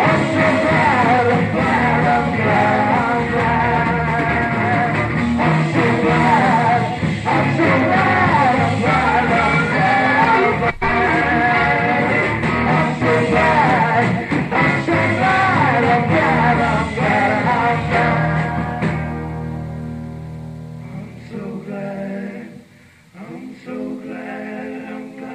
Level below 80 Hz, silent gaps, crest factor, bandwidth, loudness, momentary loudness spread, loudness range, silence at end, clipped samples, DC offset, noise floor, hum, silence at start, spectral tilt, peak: -38 dBFS; none; 16 dB; 9.6 kHz; -16 LUFS; 15 LU; 15 LU; 0 s; under 0.1%; under 0.1%; -47 dBFS; none; 0 s; -7 dB/octave; -2 dBFS